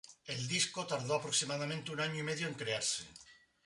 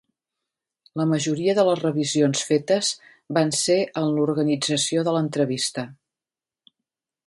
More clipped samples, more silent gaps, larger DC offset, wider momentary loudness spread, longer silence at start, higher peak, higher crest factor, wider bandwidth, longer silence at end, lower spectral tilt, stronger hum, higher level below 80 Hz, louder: neither; neither; neither; about the same, 8 LU vs 7 LU; second, 0.1 s vs 0.95 s; second, -18 dBFS vs -6 dBFS; about the same, 20 dB vs 18 dB; about the same, 11.5 kHz vs 11.5 kHz; second, 0.3 s vs 1.35 s; second, -2.5 dB/octave vs -4.5 dB/octave; neither; second, -74 dBFS vs -68 dBFS; second, -36 LUFS vs -22 LUFS